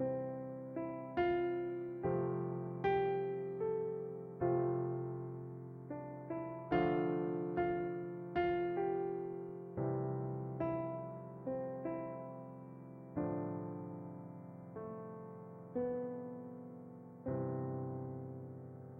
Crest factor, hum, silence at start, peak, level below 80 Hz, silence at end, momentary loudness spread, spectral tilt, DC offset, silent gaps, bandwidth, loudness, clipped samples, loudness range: 18 dB; none; 0 s; -22 dBFS; -68 dBFS; 0 s; 14 LU; -10.5 dB/octave; under 0.1%; none; 4.7 kHz; -40 LUFS; under 0.1%; 8 LU